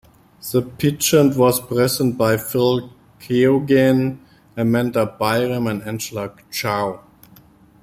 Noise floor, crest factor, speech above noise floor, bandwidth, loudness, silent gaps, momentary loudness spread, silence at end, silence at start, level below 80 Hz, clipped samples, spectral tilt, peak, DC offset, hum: -49 dBFS; 16 dB; 31 dB; 16 kHz; -19 LUFS; none; 12 LU; 0.85 s; 0.45 s; -54 dBFS; under 0.1%; -5.5 dB/octave; -2 dBFS; under 0.1%; none